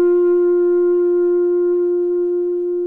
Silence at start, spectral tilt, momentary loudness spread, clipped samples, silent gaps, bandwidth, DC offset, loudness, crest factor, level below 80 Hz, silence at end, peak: 0 s; -9 dB/octave; 4 LU; under 0.1%; none; 1.9 kHz; under 0.1%; -16 LUFS; 6 dB; -62 dBFS; 0 s; -10 dBFS